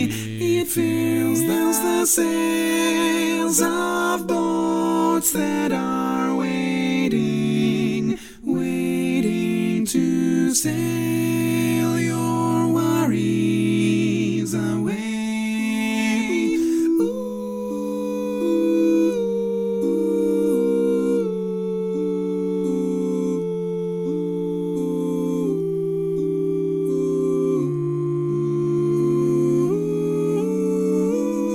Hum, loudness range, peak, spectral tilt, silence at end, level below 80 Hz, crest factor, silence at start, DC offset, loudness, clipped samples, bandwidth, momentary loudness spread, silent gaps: none; 4 LU; -6 dBFS; -5.5 dB/octave; 0 s; -56 dBFS; 16 dB; 0 s; under 0.1%; -21 LUFS; under 0.1%; 16.5 kHz; 6 LU; none